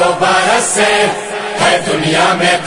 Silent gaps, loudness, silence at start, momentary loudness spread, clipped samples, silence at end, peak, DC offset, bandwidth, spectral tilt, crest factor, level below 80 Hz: none; -11 LUFS; 0 s; 5 LU; under 0.1%; 0 s; 0 dBFS; under 0.1%; 11 kHz; -2.5 dB/octave; 12 dB; -46 dBFS